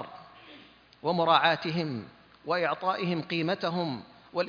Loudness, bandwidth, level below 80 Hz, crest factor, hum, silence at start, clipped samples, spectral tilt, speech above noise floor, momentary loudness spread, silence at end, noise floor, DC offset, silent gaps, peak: -28 LUFS; 5.2 kHz; -72 dBFS; 22 dB; none; 0 s; under 0.1%; -6.5 dB/octave; 26 dB; 22 LU; 0 s; -54 dBFS; under 0.1%; none; -8 dBFS